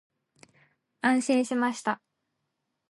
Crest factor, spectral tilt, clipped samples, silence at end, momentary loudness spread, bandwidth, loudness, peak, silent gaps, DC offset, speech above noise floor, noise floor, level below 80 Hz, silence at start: 18 dB; -3.5 dB/octave; under 0.1%; 0.95 s; 8 LU; 11.5 kHz; -27 LUFS; -12 dBFS; none; under 0.1%; 55 dB; -81 dBFS; -84 dBFS; 1.05 s